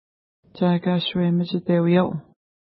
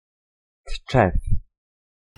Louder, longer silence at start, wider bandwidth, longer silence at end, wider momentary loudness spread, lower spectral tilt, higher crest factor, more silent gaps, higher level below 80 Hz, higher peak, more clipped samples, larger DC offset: about the same, -21 LUFS vs -23 LUFS; about the same, 0.55 s vs 0.65 s; second, 5 kHz vs 10.5 kHz; second, 0.5 s vs 0.75 s; second, 6 LU vs 18 LU; first, -12 dB/octave vs -7 dB/octave; second, 16 dB vs 22 dB; neither; second, -60 dBFS vs -30 dBFS; second, -8 dBFS vs -4 dBFS; neither; neither